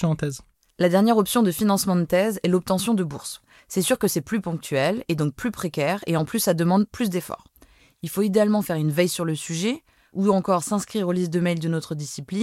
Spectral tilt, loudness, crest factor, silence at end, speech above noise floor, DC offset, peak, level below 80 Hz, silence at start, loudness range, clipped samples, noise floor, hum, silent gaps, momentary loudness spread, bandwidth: -5.5 dB/octave; -23 LUFS; 18 dB; 0 s; 33 dB; under 0.1%; -6 dBFS; -58 dBFS; 0 s; 3 LU; under 0.1%; -55 dBFS; none; none; 11 LU; 16.5 kHz